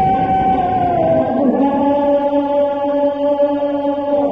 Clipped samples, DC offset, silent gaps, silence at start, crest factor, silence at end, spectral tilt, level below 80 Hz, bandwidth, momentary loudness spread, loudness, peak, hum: under 0.1%; 0.2%; none; 0 s; 12 dB; 0 s; -9 dB/octave; -42 dBFS; 5 kHz; 2 LU; -15 LUFS; -4 dBFS; none